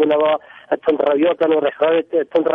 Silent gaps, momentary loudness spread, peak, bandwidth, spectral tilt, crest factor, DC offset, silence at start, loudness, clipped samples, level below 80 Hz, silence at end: none; 5 LU; -4 dBFS; 4.4 kHz; -7.5 dB/octave; 12 dB; under 0.1%; 0 s; -17 LUFS; under 0.1%; -62 dBFS; 0 s